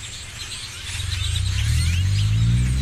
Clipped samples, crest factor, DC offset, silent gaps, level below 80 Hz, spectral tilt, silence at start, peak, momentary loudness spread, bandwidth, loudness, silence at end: under 0.1%; 12 dB; under 0.1%; none; -28 dBFS; -4 dB/octave; 0 s; -10 dBFS; 11 LU; 14 kHz; -23 LUFS; 0 s